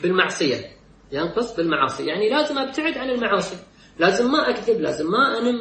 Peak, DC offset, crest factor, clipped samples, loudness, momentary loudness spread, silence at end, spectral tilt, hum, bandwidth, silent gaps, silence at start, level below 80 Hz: -4 dBFS; under 0.1%; 18 dB; under 0.1%; -21 LUFS; 9 LU; 0 s; -4.5 dB/octave; none; 8.8 kHz; none; 0 s; -56 dBFS